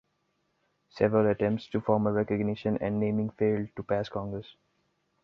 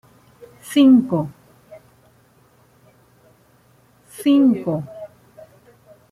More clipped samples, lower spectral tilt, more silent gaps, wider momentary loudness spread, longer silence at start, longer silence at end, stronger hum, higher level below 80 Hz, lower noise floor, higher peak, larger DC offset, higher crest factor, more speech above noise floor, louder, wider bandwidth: neither; first, -9 dB/octave vs -6.5 dB/octave; neither; second, 8 LU vs 27 LU; first, 0.95 s vs 0.65 s; second, 0.7 s vs 1.05 s; neither; first, -58 dBFS vs -64 dBFS; first, -75 dBFS vs -55 dBFS; second, -10 dBFS vs -4 dBFS; neither; about the same, 20 dB vs 18 dB; first, 47 dB vs 40 dB; second, -29 LUFS vs -17 LUFS; second, 6.4 kHz vs 13 kHz